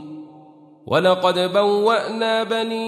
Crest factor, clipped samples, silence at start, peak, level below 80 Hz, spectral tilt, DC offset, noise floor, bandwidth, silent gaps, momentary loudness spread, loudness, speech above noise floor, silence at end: 16 dB; under 0.1%; 0 s; -4 dBFS; -68 dBFS; -5 dB/octave; under 0.1%; -46 dBFS; 13.5 kHz; none; 5 LU; -19 LUFS; 28 dB; 0 s